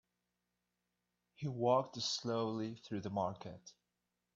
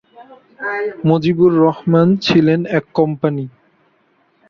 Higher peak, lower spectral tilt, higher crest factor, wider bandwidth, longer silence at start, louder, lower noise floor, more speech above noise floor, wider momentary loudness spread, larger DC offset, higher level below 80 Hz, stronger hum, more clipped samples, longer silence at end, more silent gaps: second, -20 dBFS vs -2 dBFS; second, -5 dB/octave vs -8 dB/octave; first, 22 dB vs 14 dB; first, 7.8 kHz vs 7 kHz; first, 1.4 s vs 0.2 s; second, -38 LUFS vs -15 LUFS; first, -88 dBFS vs -58 dBFS; first, 49 dB vs 44 dB; first, 15 LU vs 11 LU; neither; second, -78 dBFS vs -54 dBFS; first, 60 Hz at -60 dBFS vs none; neither; second, 0.65 s vs 1 s; neither